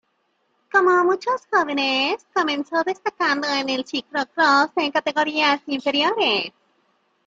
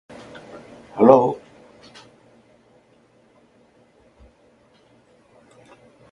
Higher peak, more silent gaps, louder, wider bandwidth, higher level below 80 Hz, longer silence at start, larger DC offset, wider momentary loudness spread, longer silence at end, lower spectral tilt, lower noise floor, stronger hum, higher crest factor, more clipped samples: second, -4 dBFS vs 0 dBFS; neither; second, -20 LUFS vs -16 LUFS; about the same, 7.6 kHz vs 7.4 kHz; second, -72 dBFS vs -62 dBFS; second, 0.75 s vs 0.95 s; neither; second, 7 LU vs 28 LU; second, 0.75 s vs 4.75 s; second, -2.5 dB/octave vs -8 dB/octave; first, -69 dBFS vs -57 dBFS; neither; second, 18 dB vs 26 dB; neither